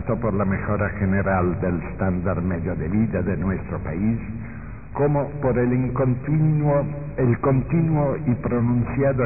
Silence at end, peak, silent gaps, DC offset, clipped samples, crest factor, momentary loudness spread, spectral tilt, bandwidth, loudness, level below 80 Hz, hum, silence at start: 0 s; -8 dBFS; none; 0.9%; under 0.1%; 14 dB; 6 LU; -16 dB/octave; 2.7 kHz; -22 LUFS; -36 dBFS; none; 0 s